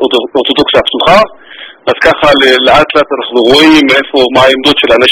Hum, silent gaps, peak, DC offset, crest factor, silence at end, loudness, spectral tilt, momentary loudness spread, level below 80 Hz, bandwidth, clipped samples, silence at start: none; none; 0 dBFS; under 0.1%; 6 dB; 0 s; -6 LUFS; -4 dB/octave; 6 LU; -36 dBFS; 18 kHz; 5%; 0 s